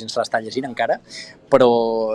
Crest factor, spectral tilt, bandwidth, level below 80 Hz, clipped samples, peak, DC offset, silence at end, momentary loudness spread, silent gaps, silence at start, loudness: 18 dB; -5 dB/octave; 11 kHz; -60 dBFS; under 0.1%; -2 dBFS; under 0.1%; 0 s; 15 LU; none; 0 s; -19 LUFS